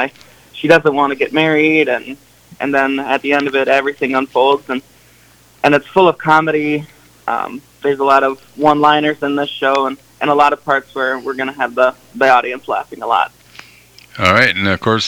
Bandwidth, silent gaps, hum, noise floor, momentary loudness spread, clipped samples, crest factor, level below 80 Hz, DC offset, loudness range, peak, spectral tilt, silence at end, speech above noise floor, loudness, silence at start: 19 kHz; none; none; -47 dBFS; 10 LU; under 0.1%; 16 dB; -54 dBFS; under 0.1%; 2 LU; 0 dBFS; -5 dB/octave; 0 s; 33 dB; -14 LUFS; 0 s